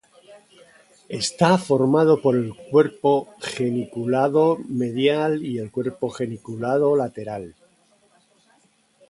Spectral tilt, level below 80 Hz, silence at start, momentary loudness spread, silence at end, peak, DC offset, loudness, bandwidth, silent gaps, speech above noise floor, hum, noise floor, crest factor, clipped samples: -6 dB/octave; -64 dBFS; 0.3 s; 12 LU; 1.6 s; -2 dBFS; under 0.1%; -21 LUFS; 11.5 kHz; none; 40 dB; none; -61 dBFS; 20 dB; under 0.1%